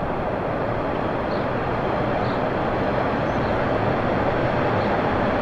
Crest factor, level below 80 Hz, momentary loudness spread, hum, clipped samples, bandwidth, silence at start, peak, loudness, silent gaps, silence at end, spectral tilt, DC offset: 12 dB; -38 dBFS; 3 LU; none; under 0.1%; 8.6 kHz; 0 s; -10 dBFS; -23 LUFS; none; 0 s; -8 dB/octave; under 0.1%